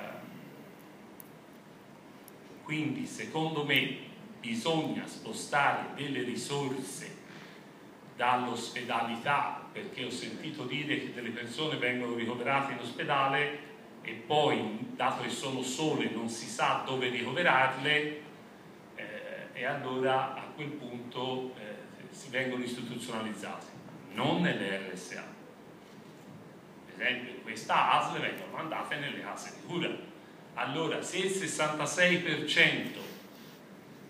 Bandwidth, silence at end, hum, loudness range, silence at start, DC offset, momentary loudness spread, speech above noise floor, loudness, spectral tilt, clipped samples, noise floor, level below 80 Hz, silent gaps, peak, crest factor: 15.5 kHz; 0 s; none; 6 LU; 0 s; under 0.1%; 23 LU; 20 dB; -32 LUFS; -4 dB/octave; under 0.1%; -53 dBFS; -80 dBFS; none; -8 dBFS; 24 dB